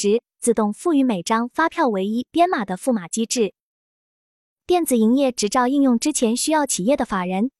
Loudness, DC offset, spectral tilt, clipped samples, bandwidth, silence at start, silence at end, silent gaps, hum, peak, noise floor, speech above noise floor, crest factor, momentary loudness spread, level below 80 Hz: -20 LUFS; under 0.1%; -4 dB/octave; under 0.1%; 13.5 kHz; 0 s; 0.1 s; 3.60-4.57 s; none; -6 dBFS; under -90 dBFS; over 70 dB; 14 dB; 5 LU; -56 dBFS